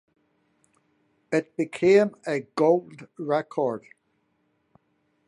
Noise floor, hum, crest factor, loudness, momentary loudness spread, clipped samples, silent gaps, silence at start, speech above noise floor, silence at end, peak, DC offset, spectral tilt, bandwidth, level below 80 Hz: -71 dBFS; none; 20 dB; -24 LUFS; 13 LU; under 0.1%; none; 1.3 s; 47 dB; 1.5 s; -8 dBFS; under 0.1%; -6.5 dB/octave; 11 kHz; -72 dBFS